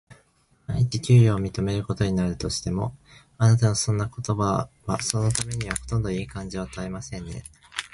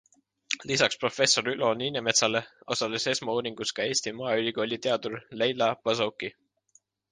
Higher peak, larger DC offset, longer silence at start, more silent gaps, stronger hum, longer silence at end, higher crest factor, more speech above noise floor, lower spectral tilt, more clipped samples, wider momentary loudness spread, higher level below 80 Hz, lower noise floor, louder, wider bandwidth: first, 0 dBFS vs -6 dBFS; neither; second, 0.1 s vs 0.5 s; neither; neither; second, 0.05 s vs 0.8 s; about the same, 24 dB vs 22 dB; about the same, 39 dB vs 38 dB; first, -5.5 dB/octave vs -2.5 dB/octave; neither; first, 15 LU vs 9 LU; first, -44 dBFS vs -70 dBFS; about the same, -63 dBFS vs -65 dBFS; about the same, -25 LUFS vs -27 LUFS; about the same, 11.5 kHz vs 10.5 kHz